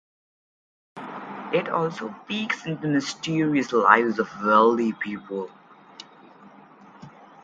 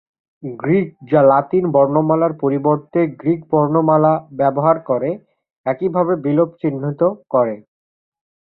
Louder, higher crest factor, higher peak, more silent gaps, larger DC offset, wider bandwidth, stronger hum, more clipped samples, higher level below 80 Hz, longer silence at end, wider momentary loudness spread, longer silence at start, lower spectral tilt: second, -23 LUFS vs -17 LUFS; first, 24 dB vs 16 dB; about the same, 0 dBFS vs -2 dBFS; second, none vs 5.58-5.64 s; neither; first, 9 kHz vs 4.1 kHz; neither; neither; second, -70 dBFS vs -60 dBFS; second, 0.2 s vs 0.95 s; first, 20 LU vs 10 LU; first, 0.95 s vs 0.45 s; second, -5.5 dB/octave vs -13 dB/octave